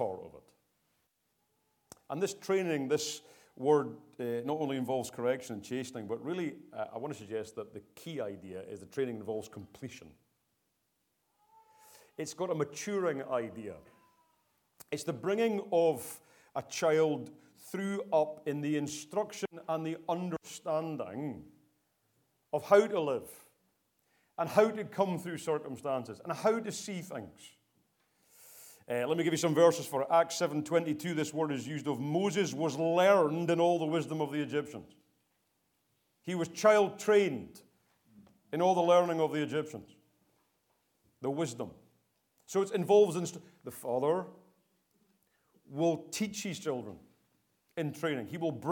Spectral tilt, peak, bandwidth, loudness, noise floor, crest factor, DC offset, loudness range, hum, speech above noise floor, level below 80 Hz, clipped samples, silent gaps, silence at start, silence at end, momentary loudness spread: -5 dB/octave; -12 dBFS; 19 kHz; -32 LUFS; -80 dBFS; 22 dB; under 0.1%; 10 LU; none; 47 dB; -78 dBFS; under 0.1%; none; 0 s; 0 s; 18 LU